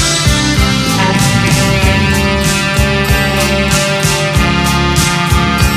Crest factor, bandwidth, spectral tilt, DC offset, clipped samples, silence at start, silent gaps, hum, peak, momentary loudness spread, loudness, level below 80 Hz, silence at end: 10 dB; 16 kHz; -4 dB/octave; under 0.1%; under 0.1%; 0 s; none; none; 0 dBFS; 1 LU; -11 LUFS; -20 dBFS; 0 s